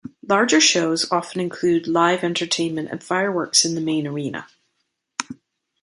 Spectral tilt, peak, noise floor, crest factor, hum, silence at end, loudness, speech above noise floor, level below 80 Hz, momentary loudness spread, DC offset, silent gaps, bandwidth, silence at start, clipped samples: -3 dB/octave; -2 dBFS; -74 dBFS; 20 dB; none; 0.5 s; -20 LUFS; 54 dB; -66 dBFS; 15 LU; under 0.1%; none; 11.5 kHz; 0.05 s; under 0.1%